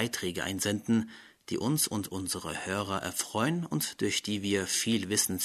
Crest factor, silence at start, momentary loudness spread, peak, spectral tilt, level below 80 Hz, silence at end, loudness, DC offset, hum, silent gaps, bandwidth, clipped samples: 20 dB; 0 s; 6 LU; -12 dBFS; -3.5 dB/octave; -64 dBFS; 0 s; -31 LUFS; under 0.1%; none; none; 13.5 kHz; under 0.1%